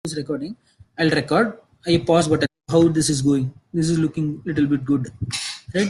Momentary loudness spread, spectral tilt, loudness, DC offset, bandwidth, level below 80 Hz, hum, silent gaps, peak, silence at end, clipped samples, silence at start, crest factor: 9 LU; -5.5 dB/octave; -21 LUFS; under 0.1%; 12.5 kHz; -52 dBFS; none; none; -4 dBFS; 0 s; under 0.1%; 0.05 s; 16 dB